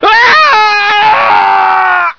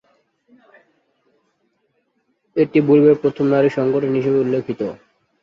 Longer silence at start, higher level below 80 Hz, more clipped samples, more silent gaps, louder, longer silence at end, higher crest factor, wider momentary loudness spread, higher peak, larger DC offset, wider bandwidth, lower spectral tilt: second, 0 s vs 2.55 s; first, -48 dBFS vs -62 dBFS; first, 1% vs under 0.1%; neither; first, -6 LUFS vs -17 LUFS; second, 0.05 s vs 0.5 s; second, 6 dB vs 16 dB; second, 4 LU vs 13 LU; about the same, 0 dBFS vs -2 dBFS; neither; second, 5.4 kHz vs 6.6 kHz; second, -1.5 dB/octave vs -9 dB/octave